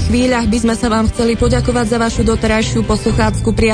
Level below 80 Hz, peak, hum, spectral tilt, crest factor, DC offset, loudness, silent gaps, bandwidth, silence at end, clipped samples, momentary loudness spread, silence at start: -22 dBFS; -2 dBFS; none; -5.5 dB/octave; 12 dB; under 0.1%; -14 LUFS; none; 10.5 kHz; 0 s; under 0.1%; 2 LU; 0 s